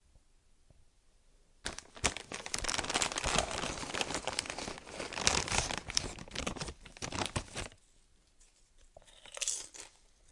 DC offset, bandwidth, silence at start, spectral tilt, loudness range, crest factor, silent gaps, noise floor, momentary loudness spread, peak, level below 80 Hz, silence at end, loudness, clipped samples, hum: under 0.1%; 12 kHz; 0.15 s; -1.5 dB/octave; 8 LU; 34 dB; none; -66 dBFS; 13 LU; -6 dBFS; -52 dBFS; 0.45 s; -36 LUFS; under 0.1%; none